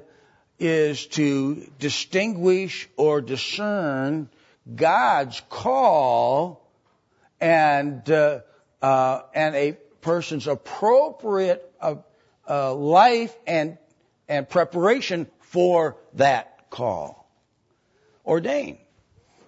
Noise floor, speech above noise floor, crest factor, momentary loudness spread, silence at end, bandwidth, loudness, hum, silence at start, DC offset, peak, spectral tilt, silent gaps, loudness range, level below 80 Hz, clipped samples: -67 dBFS; 46 dB; 18 dB; 11 LU; 0.75 s; 8 kHz; -22 LUFS; none; 0.6 s; under 0.1%; -4 dBFS; -5.5 dB/octave; none; 3 LU; -68 dBFS; under 0.1%